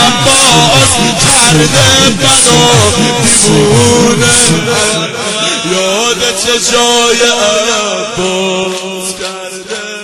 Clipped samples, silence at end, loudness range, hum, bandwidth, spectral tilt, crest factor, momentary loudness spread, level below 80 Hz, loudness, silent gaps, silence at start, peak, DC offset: 0.7%; 0 s; 5 LU; none; over 20 kHz; -2.5 dB/octave; 8 dB; 12 LU; -34 dBFS; -7 LUFS; none; 0 s; 0 dBFS; under 0.1%